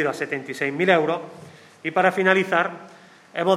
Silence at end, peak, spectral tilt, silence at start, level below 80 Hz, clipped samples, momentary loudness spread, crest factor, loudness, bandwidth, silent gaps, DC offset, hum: 0 s; -2 dBFS; -5.5 dB/octave; 0 s; -76 dBFS; under 0.1%; 14 LU; 22 dB; -22 LUFS; 13.5 kHz; none; under 0.1%; none